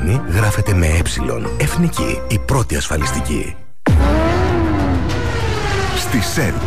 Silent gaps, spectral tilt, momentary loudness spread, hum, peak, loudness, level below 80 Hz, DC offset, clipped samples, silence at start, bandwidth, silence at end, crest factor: none; -5.5 dB/octave; 6 LU; none; -6 dBFS; -17 LUFS; -24 dBFS; 5%; under 0.1%; 0 s; 15.5 kHz; 0 s; 12 dB